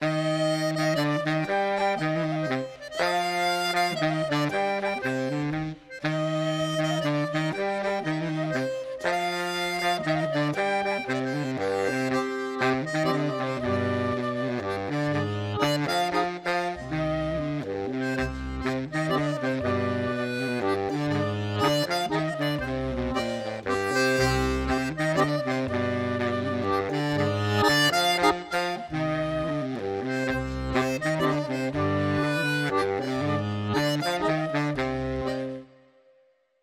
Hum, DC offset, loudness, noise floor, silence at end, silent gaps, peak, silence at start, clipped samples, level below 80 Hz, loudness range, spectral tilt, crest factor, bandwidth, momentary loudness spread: none; under 0.1%; -27 LUFS; -64 dBFS; 1 s; none; -8 dBFS; 0 s; under 0.1%; -46 dBFS; 3 LU; -5.5 dB/octave; 18 dB; 16 kHz; 5 LU